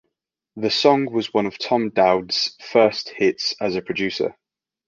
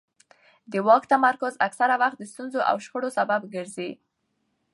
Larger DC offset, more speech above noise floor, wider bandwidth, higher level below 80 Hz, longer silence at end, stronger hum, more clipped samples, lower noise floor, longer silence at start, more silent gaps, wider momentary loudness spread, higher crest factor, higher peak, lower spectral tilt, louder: neither; first, 60 dB vs 51 dB; second, 7.4 kHz vs 11.5 kHz; first, -60 dBFS vs -80 dBFS; second, 0.55 s vs 0.8 s; neither; neither; first, -80 dBFS vs -75 dBFS; second, 0.55 s vs 0.7 s; neither; second, 7 LU vs 14 LU; about the same, 20 dB vs 20 dB; about the same, -2 dBFS vs -4 dBFS; about the same, -4.5 dB/octave vs -4.5 dB/octave; first, -20 LUFS vs -24 LUFS